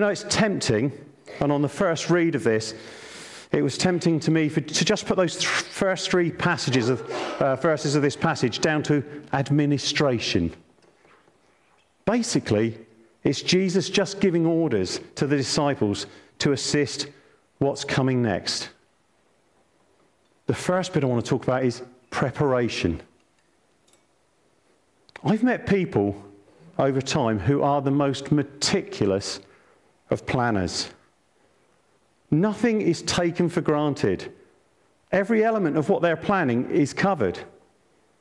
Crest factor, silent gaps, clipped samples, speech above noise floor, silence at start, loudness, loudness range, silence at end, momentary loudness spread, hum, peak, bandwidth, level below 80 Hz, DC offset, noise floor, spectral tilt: 16 dB; none; under 0.1%; 42 dB; 0 s; -24 LUFS; 5 LU; 0.7 s; 8 LU; none; -10 dBFS; 12 kHz; -56 dBFS; under 0.1%; -65 dBFS; -5 dB/octave